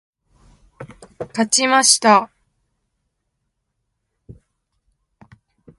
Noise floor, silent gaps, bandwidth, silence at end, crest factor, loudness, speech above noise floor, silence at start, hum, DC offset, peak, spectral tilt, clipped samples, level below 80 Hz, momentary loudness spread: -74 dBFS; none; 11.5 kHz; 1.45 s; 22 dB; -14 LUFS; 59 dB; 0.8 s; none; under 0.1%; 0 dBFS; -1.5 dB/octave; under 0.1%; -60 dBFS; 21 LU